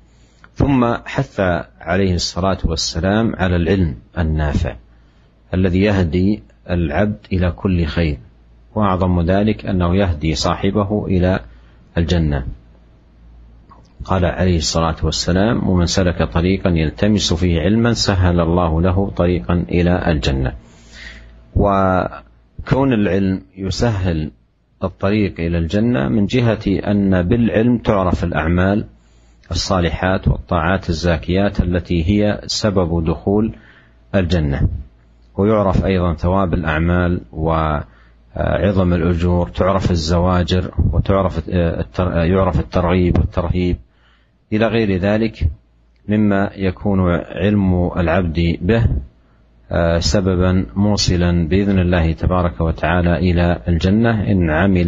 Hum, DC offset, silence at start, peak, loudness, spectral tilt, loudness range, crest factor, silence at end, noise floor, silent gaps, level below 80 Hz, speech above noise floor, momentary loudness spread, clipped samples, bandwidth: none; under 0.1%; 0.6 s; 0 dBFS; -17 LUFS; -6.5 dB/octave; 3 LU; 16 dB; 0 s; -54 dBFS; none; -28 dBFS; 38 dB; 7 LU; under 0.1%; 8 kHz